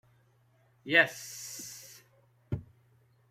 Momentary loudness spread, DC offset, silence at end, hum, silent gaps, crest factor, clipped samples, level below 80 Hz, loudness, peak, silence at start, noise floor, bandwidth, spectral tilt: 24 LU; under 0.1%; 0.65 s; none; none; 26 dB; under 0.1%; -64 dBFS; -30 LUFS; -10 dBFS; 0.85 s; -67 dBFS; 16 kHz; -3 dB/octave